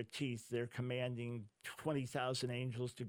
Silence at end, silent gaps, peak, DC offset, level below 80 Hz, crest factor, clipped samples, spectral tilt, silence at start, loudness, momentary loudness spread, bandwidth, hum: 0 s; none; -24 dBFS; under 0.1%; -76 dBFS; 18 dB; under 0.1%; -5.5 dB/octave; 0 s; -42 LUFS; 6 LU; 17.5 kHz; none